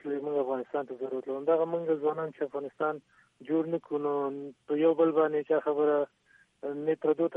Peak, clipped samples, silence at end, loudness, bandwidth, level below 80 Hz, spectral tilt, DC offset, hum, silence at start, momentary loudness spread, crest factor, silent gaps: -12 dBFS; under 0.1%; 0 s; -30 LUFS; 3.7 kHz; -82 dBFS; -9 dB/octave; under 0.1%; none; 0.05 s; 10 LU; 16 dB; none